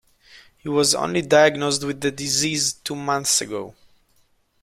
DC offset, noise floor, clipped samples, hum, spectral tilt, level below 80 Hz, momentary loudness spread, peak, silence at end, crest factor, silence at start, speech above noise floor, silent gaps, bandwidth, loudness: under 0.1%; -62 dBFS; under 0.1%; none; -2.5 dB/octave; -60 dBFS; 14 LU; -2 dBFS; 0.95 s; 20 dB; 0.35 s; 41 dB; none; 16 kHz; -20 LUFS